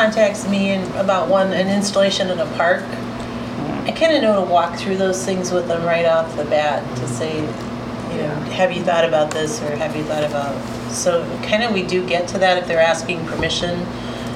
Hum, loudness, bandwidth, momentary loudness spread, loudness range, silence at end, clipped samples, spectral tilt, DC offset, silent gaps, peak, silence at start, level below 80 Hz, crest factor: none; -19 LUFS; 15 kHz; 9 LU; 2 LU; 0 s; under 0.1%; -4.5 dB/octave; under 0.1%; none; -4 dBFS; 0 s; -46 dBFS; 16 dB